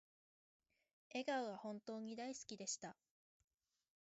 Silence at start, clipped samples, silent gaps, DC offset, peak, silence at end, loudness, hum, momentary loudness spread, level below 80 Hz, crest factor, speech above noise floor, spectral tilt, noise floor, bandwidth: 1.1 s; under 0.1%; none; under 0.1%; -32 dBFS; 1.15 s; -48 LUFS; none; 7 LU; under -90 dBFS; 20 dB; over 42 dB; -2.5 dB/octave; under -90 dBFS; 8 kHz